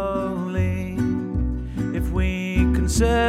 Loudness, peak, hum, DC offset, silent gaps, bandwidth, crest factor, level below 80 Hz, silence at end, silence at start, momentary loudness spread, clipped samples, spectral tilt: -23 LUFS; -6 dBFS; none; under 0.1%; none; 15 kHz; 14 dB; -26 dBFS; 0 s; 0 s; 6 LU; under 0.1%; -6 dB/octave